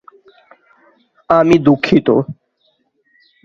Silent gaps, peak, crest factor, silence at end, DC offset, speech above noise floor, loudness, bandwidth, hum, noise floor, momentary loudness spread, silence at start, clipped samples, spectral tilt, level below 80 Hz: none; 0 dBFS; 16 dB; 1.1 s; under 0.1%; 51 dB; -13 LUFS; 7.6 kHz; none; -62 dBFS; 6 LU; 1.3 s; under 0.1%; -7.5 dB/octave; -50 dBFS